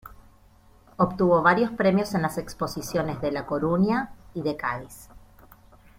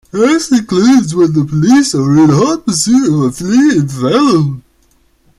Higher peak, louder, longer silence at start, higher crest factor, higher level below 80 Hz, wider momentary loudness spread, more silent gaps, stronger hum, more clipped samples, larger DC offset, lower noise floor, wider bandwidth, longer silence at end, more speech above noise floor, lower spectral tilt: second, -4 dBFS vs 0 dBFS; second, -25 LUFS vs -10 LUFS; about the same, 0.05 s vs 0.15 s; first, 22 dB vs 10 dB; second, -52 dBFS vs -46 dBFS; first, 12 LU vs 4 LU; neither; neither; neither; neither; about the same, -55 dBFS vs -52 dBFS; first, 16.5 kHz vs 13 kHz; about the same, 0.8 s vs 0.8 s; second, 31 dB vs 42 dB; about the same, -6.5 dB/octave vs -5.5 dB/octave